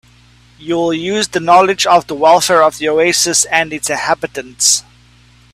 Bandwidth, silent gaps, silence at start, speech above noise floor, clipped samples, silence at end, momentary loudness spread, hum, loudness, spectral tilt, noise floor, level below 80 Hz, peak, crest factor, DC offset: 16 kHz; none; 0.6 s; 33 dB; under 0.1%; 0.75 s; 8 LU; 60 Hz at -45 dBFS; -12 LUFS; -2 dB/octave; -46 dBFS; -50 dBFS; 0 dBFS; 14 dB; under 0.1%